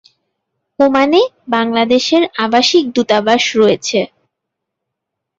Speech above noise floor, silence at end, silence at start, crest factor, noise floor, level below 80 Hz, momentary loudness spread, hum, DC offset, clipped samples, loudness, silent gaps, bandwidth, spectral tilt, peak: 65 dB; 1.35 s; 0.8 s; 14 dB; -78 dBFS; -56 dBFS; 6 LU; none; under 0.1%; under 0.1%; -13 LUFS; none; 8 kHz; -3.5 dB/octave; 0 dBFS